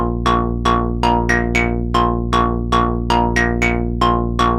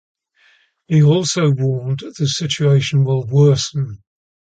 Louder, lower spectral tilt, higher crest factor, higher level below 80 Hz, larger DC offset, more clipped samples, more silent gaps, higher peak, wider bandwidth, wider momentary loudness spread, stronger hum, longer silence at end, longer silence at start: about the same, -17 LUFS vs -16 LUFS; about the same, -6 dB/octave vs -6 dB/octave; about the same, 16 dB vs 14 dB; first, -24 dBFS vs -54 dBFS; neither; neither; neither; about the same, 0 dBFS vs -2 dBFS; first, 12 kHz vs 9 kHz; second, 2 LU vs 9 LU; neither; second, 0 s vs 0.55 s; second, 0 s vs 0.9 s